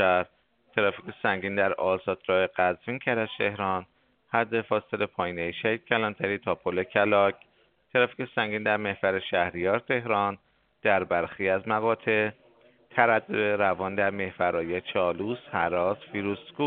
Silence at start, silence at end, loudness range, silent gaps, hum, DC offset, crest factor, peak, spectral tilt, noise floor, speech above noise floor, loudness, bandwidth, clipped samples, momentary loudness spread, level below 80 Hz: 0 s; 0 s; 2 LU; none; none; under 0.1%; 24 dB; -4 dBFS; -3 dB/octave; -59 dBFS; 32 dB; -27 LUFS; 4.6 kHz; under 0.1%; 6 LU; -66 dBFS